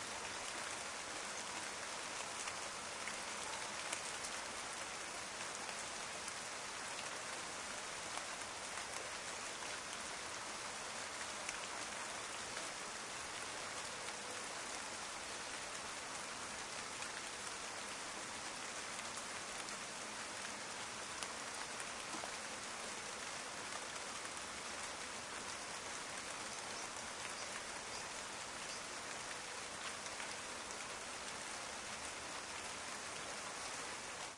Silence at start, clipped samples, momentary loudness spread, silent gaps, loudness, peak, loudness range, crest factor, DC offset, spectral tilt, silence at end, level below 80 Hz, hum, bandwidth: 0 s; under 0.1%; 2 LU; none; -44 LUFS; -22 dBFS; 1 LU; 24 dB; under 0.1%; -0.5 dB/octave; 0 s; -74 dBFS; none; 12 kHz